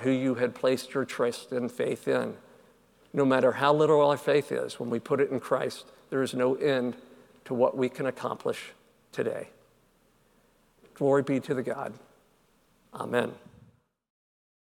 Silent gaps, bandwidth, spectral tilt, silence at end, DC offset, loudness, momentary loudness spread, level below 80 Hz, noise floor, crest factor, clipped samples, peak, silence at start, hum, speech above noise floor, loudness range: none; 16.5 kHz; -6 dB/octave; 1.4 s; under 0.1%; -28 LUFS; 14 LU; -74 dBFS; -66 dBFS; 20 dB; under 0.1%; -8 dBFS; 0 s; none; 38 dB; 7 LU